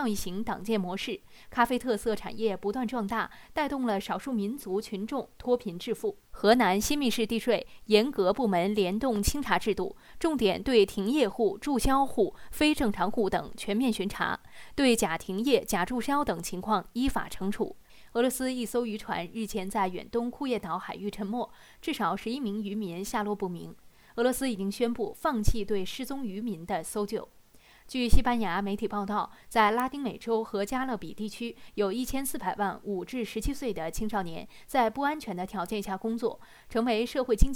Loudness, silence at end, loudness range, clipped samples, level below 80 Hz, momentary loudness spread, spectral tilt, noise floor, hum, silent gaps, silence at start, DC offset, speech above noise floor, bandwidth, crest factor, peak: -30 LUFS; 0 s; 6 LU; under 0.1%; -40 dBFS; 10 LU; -4.5 dB/octave; -57 dBFS; none; none; 0 s; under 0.1%; 28 dB; 18.5 kHz; 22 dB; -6 dBFS